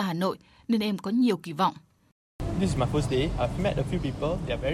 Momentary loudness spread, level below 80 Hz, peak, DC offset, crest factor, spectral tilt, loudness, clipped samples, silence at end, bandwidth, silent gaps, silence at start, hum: 5 LU; -40 dBFS; -12 dBFS; under 0.1%; 16 dB; -6.5 dB/octave; -28 LUFS; under 0.1%; 0 s; 14.5 kHz; 2.12-2.39 s; 0 s; none